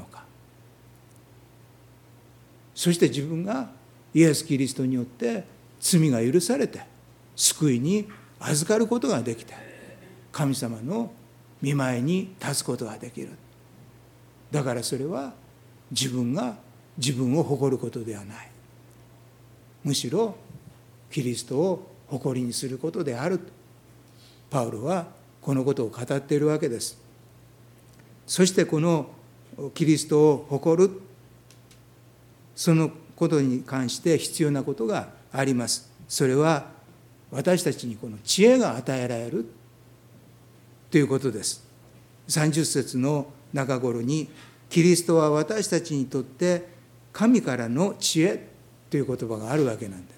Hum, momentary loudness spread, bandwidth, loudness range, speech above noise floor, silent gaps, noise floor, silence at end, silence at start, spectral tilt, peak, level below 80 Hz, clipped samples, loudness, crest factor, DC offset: none; 15 LU; 18.5 kHz; 6 LU; 29 dB; none; -53 dBFS; 0.1 s; 0 s; -5 dB/octave; -6 dBFS; -66 dBFS; under 0.1%; -25 LUFS; 20 dB; under 0.1%